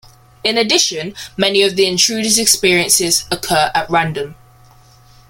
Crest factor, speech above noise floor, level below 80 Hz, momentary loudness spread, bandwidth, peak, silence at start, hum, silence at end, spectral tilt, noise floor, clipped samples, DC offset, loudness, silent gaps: 16 dB; 30 dB; -46 dBFS; 10 LU; 17 kHz; 0 dBFS; 0.45 s; none; 0.95 s; -2 dB/octave; -45 dBFS; under 0.1%; under 0.1%; -13 LUFS; none